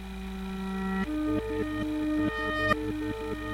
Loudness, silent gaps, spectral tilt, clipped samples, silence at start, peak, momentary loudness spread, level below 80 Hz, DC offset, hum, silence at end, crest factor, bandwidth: -31 LUFS; none; -6.5 dB/octave; under 0.1%; 0 s; -12 dBFS; 8 LU; -44 dBFS; under 0.1%; none; 0 s; 20 dB; 16 kHz